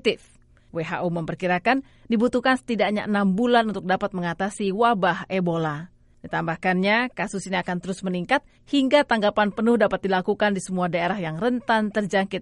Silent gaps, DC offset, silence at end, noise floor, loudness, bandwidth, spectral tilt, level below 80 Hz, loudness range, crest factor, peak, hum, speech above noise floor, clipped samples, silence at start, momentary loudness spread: none; under 0.1%; 0 s; -54 dBFS; -23 LUFS; 11.5 kHz; -5.5 dB/octave; -56 dBFS; 3 LU; 18 dB; -6 dBFS; none; 31 dB; under 0.1%; 0.05 s; 8 LU